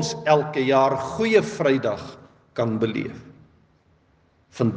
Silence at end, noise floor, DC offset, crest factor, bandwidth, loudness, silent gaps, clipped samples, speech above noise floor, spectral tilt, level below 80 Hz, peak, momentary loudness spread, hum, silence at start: 0 s; -61 dBFS; under 0.1%; 20 dB; 9.4 kHz; -22 LUFS; none; under 0.1%; 39 dB; -5.5 dB/octave; -62 dBFS; -4 dBFS; 15 LU; none; 0 s